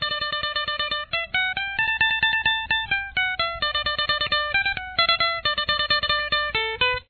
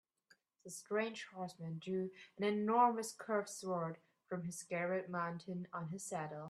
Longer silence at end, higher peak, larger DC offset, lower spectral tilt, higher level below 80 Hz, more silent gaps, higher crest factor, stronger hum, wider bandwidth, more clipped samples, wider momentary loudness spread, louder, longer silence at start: about the same, 0.05 s vs 0 s; first, -6 dBFS vs -18 dBFS; neither; second, -3.5 dB/octave vs -5 dB/octave; first, -46 dBFS vs -86 dBFS; neither; about the same, 18 dB vs 22 dB; neither; second, 4.6 kHz vs 14 kHz; neither; second, 5 LU vs 13 LU; first, -22 LUFS vs -40 LUFS; second, 0 s vs 0.65 s